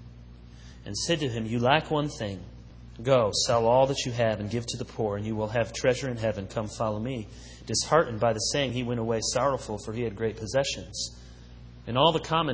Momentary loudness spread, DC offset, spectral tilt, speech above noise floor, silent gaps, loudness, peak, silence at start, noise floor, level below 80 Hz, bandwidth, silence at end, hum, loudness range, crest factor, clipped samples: 12 LU; under 0.1%; -4.5 dB/octave; 20 dB; none; -27 LUFS; -6 dBFS; 0 s; -47 dBFS; -48 dBFS; 8 kHz; 0 s; 60 Hz at -50 dBFS; 4 LU; 22 dB; under 0.1%